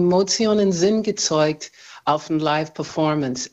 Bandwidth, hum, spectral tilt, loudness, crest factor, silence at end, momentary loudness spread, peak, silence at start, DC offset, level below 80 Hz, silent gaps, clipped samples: 8.2 kHz; none; -4.5 dB/octave; -20 LUFS; 16 dB; 0.05 s; 9 LU; -4 dBFS; 0 s; under 0.1%; -58 dBFS; none; under 0.1%